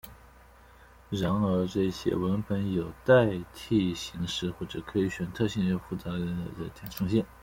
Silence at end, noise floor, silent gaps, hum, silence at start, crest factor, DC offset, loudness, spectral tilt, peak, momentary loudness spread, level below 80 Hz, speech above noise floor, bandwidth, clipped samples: 0.1 s; -54 dBFS; none; none; 0.05 s; 20 dB; under 0.1%; -29 LUFS; -6.5 dB/octave; -10 dBFS; 13 LU; -52 dBFS; 26 dB; 16.5 kHz; under 0.1%